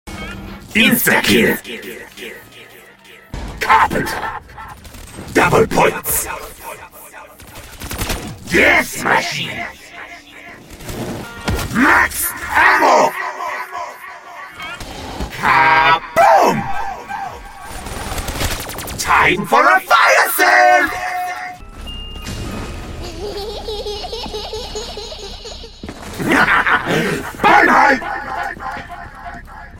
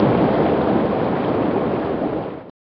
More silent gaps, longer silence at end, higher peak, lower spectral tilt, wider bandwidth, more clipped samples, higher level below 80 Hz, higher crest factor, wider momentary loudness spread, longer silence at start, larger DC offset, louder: neither; about the same, 0 s vs 0.1 s; first, 0 dBFS vs -4 dBFS; second, -3.5 dB/octave vs -10.5 dB/octave; first, 17 kHz vs 5.6 kHz; neither; first, -36 dBFS vs -44 dBFS; about the same, 18 dB vs 16 dB; first, 22 LU vs 7 LU; about the same, 0.05 s vs 0 s; neither; first, -14 LUFS vs -20 LUFS